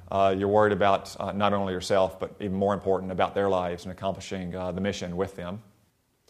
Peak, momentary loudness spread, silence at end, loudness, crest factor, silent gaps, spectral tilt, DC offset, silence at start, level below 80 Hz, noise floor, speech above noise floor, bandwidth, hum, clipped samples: -6 dBFS; 11 LU; 0.7 s; -27 LUFS; 20 dB; none; -6 dB/octave; under 0.1%; 0 s; -58 dBFS; -68 dBFS; 41 dB; 14 kHz; none; under 0.1%